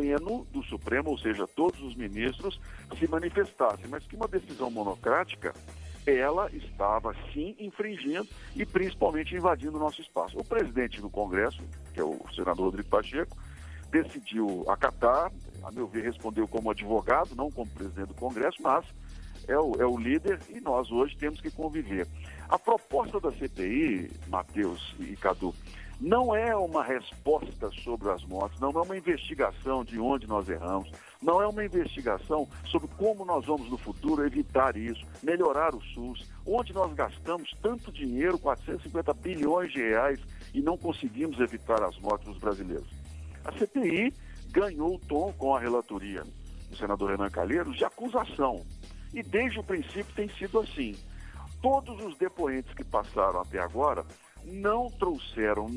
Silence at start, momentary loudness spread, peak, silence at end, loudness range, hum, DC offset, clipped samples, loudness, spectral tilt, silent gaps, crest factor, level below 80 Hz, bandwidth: 0 s; 12 LU; -8 dBFS; 0 s; 2 LU; none; under 0.1%; under 0.1%; -31 LUFS; -6 dB/octave; none; 24 dB; -46 dBFS; 11 kHz